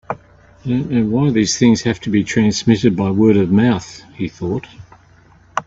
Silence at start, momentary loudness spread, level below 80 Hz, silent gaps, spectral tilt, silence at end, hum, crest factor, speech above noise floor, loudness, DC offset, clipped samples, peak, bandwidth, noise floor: 0.1 s; 14 LU; -48 dBFS; none; -6 dB/octave; 0.05 s; none; 16 dB; 33 dB; -16 LUFS; under 0.1%; under 0.1%; 0 dBFS; 7.8 kHz; -48 dBFS